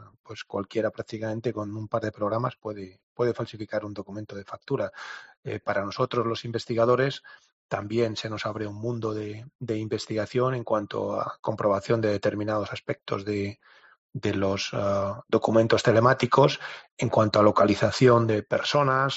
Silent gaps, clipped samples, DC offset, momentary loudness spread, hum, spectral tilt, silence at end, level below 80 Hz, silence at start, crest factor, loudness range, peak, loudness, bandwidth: 0.19-0.24 s, 3.03-3.16 s, 5.37-5.43 s, 7.53-7.69 s, 9.55-9.59 s, 11.39-11.43 s, 13.98-14.09 s, 16.92-16.97 s; under 0.1%; under 0.1%; 17 LU; none; -5 dB/octave; 0 s; -64 dBFS; 0 s; 20 dB; 9 LU; -6 dBFS; -26 LUFS; 8 kHz